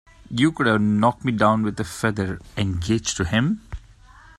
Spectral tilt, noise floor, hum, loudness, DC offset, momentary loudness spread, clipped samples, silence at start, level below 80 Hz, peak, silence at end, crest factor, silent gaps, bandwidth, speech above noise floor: -5.5 dB/octave; -48 dBFS; none; -22 LUFS; under 0.1%; 10 LU; under 0.1%; 0.3 s; -44 dBFS; -4 dBFS; 0.6 s; 20 dB; none; 13 kHz; 27 dB